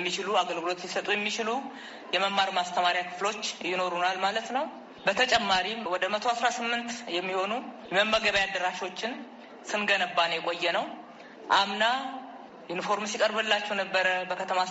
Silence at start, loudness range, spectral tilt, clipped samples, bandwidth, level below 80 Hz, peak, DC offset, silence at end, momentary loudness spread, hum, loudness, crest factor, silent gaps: 0 s; 1 LU; 0 dB/octave; under 0.1%; 8 kHz; -66 dBFS; -10 dBFS; under 0.1%; 0 s; 12 LU; none; -28 LUFS; 20 dB; none